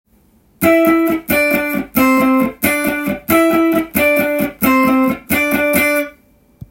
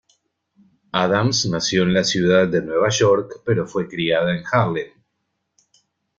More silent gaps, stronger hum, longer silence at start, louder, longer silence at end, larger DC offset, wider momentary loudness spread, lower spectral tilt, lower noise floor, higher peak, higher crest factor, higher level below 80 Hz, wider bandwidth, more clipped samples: neither; neither; second, 0.6 s vs 0.95 s; first, -14 LUFS vs -19 LUFS; second, 0.05 s vs 1.3 s; neither; about the same, 6 LU vs 7 LU; about the same, -4.5 dB/octave vs -4.5 dB/octave; second, -52 dBFS vs -74 dBFS; about the same, 0 dBFS vs -2 dBFS; about the same, 14 dB vs 18 dB; first, -44 dBFS vs -54 dBFS; first, 17 kHz vs 7.8 kHz; neither